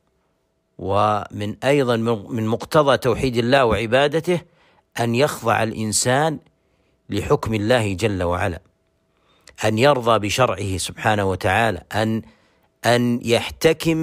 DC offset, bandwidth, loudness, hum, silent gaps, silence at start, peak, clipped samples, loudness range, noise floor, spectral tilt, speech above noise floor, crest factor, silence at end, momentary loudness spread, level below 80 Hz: under 0.1%; 16 kHz; -20 LUFS; none; none; 0.8 s; -4 dBFS; under 0.1%; 3 LU; -68 dBFS; -5 dB/octave; 49 dB; 16 dB; 0 s; 8 LU; -46 dBFS